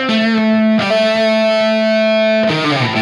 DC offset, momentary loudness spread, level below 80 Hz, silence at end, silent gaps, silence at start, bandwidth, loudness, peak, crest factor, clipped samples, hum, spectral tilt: under 0.1%; 1 LU; -58 dBFS; 0 s; none; 0 s; 11 kHz; -13 LUFS; -4 dBFS; 10 dB; under 0.1%; none; -5.5 dB/octave